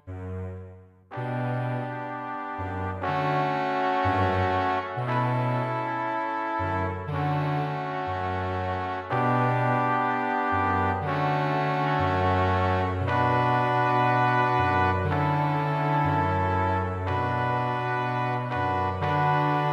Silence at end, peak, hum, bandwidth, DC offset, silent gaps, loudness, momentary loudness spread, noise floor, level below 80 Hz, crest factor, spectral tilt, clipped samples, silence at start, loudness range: 0 s; -10 dBFS; none; 8.2 kHz; under 0.1%; none; -26 LUFS; 8 LU; -47 dBFS; -56 dBFS; 16 dB; -8 dB/octave; under 0.1%; 0.05 s; 5 LU